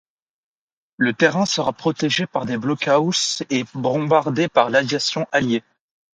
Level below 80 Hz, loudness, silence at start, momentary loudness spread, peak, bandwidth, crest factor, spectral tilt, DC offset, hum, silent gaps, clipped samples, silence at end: -62 dBFS; -20 LUFS; 1 s; 6 LU; -2 dBFS; 9.6 kHz; 18 dB; -4 dB/octave; under 0.1%; none; none; under 0.1%; 0.55 s